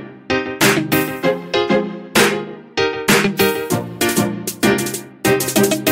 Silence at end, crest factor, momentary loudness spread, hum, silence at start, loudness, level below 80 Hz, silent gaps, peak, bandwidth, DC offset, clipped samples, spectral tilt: 0 s; 16 dB; 7 LU; none; 0 s; -17 LUFS; -50 dBFS; none; 0 dBFS; 16.5 kHz; under 0.1%; under 0.1%; -3.5 dB/octave